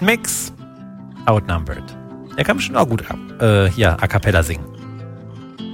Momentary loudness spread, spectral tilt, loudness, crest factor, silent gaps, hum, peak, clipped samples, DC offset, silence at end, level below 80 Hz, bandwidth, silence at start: 20 LU; -5 dB/octave; -18 LUFS; 18 dB; none; none; 0 dBFS; under 0.1%; under 0.1%; 0 s; -34 dBFS; 16.5 kHz; 0 s